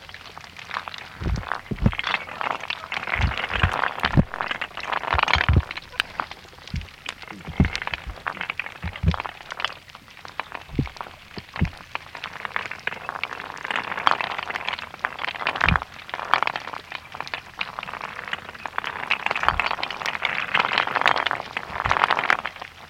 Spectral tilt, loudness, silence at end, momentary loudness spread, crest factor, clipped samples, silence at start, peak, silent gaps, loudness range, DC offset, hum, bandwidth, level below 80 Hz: -5 dB/octave; -26 LUFS; 0 s; 14 LU; 26 dB; under 0.1%; 0 s; 0 dBFS; none; 7 LU; under 0.1%; none; 16.5 kHz; -36 dBFS